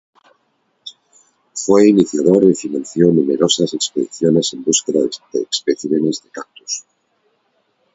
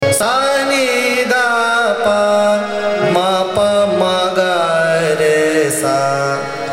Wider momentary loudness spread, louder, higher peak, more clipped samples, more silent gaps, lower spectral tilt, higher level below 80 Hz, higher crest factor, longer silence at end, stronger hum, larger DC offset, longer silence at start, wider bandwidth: first, 18 LU vs 3 LU; about the same, -16 LUFS vs -14 LUFS; about the same, 0 dBFS vs -2 dBFS; neither; neither; about the same, -4.5 dB/octave vs -3.5 dB/octave; second, -60 dBFS vs -54 dBFS; about the same, 16 dB vs 12 dB; first, 1.15 s vs 0 s; neither; neither; first, 0.85 s vs 0 s; second, 8 kHz vs 16 kHz